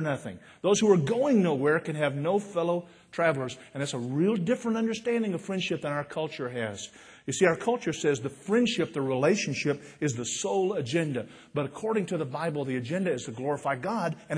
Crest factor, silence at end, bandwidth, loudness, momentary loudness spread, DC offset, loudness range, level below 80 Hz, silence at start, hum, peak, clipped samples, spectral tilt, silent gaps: 20 dB; 0 s; 10.5 kHz; -28 LUFS; 9 LU; under 0.1%; 4 LU; -68 dBFS; 0 s; none; -8 dBFS; under 0.1%; -5 dB/octave; none